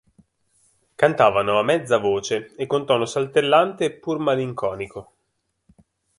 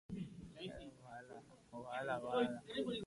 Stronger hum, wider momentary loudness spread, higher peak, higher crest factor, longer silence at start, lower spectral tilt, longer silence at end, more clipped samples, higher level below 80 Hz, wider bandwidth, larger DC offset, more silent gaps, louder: neither; second, 10 LU vs 17 LU; first, -2 dBFS vs -24 dBFS; about the same, 20 dB vs 20 dB; first, 1 s vs 0.1 s; about the same, -5 dB/octave vs -6 dB/octave; first, 1.15 s vs 0 s; neither; first, -60 dBFS vs -70 dBFS; about the same, 11.5 kHz vs 11.5 kHz; neither; neither; first, -21 LUFS vs -44 LUFS